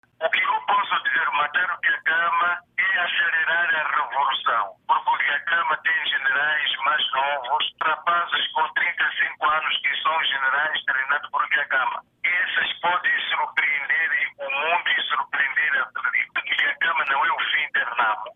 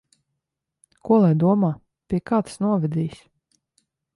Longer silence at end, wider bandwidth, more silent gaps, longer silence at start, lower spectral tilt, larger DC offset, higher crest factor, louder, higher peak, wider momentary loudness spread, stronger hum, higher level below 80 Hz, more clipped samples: second, 0.05 s vs 1 s; second, 4.4 kHz vs 11.5 kHz; neither; second, 0.2 s vs 1.05 s; second, -3 dB/octave vs -9 dB/octave; neither; about the same, 14 dB vs 16 dB; about the same, -21 LUFS vs -21 LUFS; about the same, -8 dBFS vs -8 dBFS; second, 3 LU vs 13 LU; neither; second, -74 dBFS vs -56 dBFS; neither